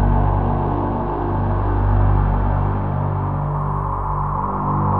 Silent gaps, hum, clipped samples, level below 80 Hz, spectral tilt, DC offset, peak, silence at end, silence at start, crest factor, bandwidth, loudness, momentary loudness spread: none; 50 Hz at -30 dBFS; under 0.1%; -24 dBFS; -11.5 dB/octave; under 0.1%; -4 dBFS; 0 s; 0 s; 14 dB; 3.7 kHz; -20 LUFS; 4 LU